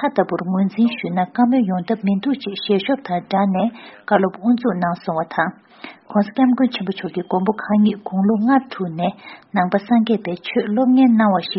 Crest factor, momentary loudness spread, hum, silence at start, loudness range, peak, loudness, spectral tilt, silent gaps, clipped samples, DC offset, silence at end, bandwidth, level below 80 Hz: 16 dB; 8 LU; none; 0 s; 2 LU; -2 dBFS; -19 LUFS; -5.5 dB/octave; none; under 0.1%; under 0.1%; 0 s; 5.8 kHz; -62 dBFS